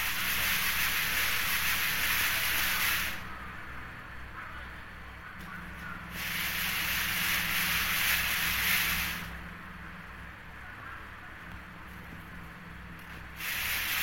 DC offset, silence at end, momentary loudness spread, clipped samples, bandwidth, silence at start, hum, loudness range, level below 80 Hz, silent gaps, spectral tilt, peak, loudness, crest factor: under 0.1%; 0 s; 18 LU; under 0.1%; 16.5 kHz; 0 s; none; 16 LU; -48 dBFS; none; -1 dB/octave; -14 dBFS; -28 LUFS; 18 dB